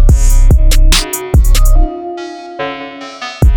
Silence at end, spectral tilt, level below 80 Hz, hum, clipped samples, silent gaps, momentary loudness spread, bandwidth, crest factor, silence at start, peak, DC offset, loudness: 0 s; -4.5 dB/octave; -8 dBFS; none; under 0.1%; none; 14 LU; 18 kHz; 8 dB; 0 s; 0 dBFS; under 0.1%; -13 LUFS